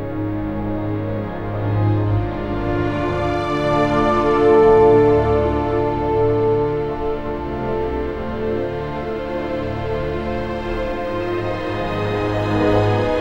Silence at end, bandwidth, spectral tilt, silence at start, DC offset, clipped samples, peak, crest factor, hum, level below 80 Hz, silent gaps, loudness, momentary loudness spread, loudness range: 0 s; 8.2 kHz; -8 dB/octave; 0 s; under 0.1%; under 0.1%; -2 dBFS; 16 dB; none; -32 dBFS; none; -19 LUFS; 10 LU; 8 LU